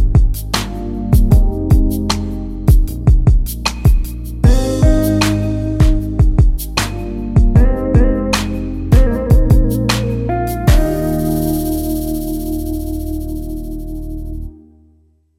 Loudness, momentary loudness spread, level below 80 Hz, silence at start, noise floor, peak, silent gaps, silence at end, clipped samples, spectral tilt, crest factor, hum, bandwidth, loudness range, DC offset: -16 LUFS; 11 LU; -16 dBFS; 0 s; -53 dBFS; 0 dBFS; none; 0.85 s; under 0.1%; -6.5 dB/octave; 14 dB; none; 16 kHz; 6 LU; under 0.1%